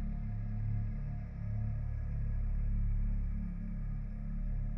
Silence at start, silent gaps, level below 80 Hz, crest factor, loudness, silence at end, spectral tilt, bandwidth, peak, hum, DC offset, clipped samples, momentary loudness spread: 0 s; none; -36 dBFS; 10 dB; -39 LUFS; 0 s; -11 dB/octave; 2.7 kHz; -26 dBFS; none; under 0.1%; under 0.1%; 5 LU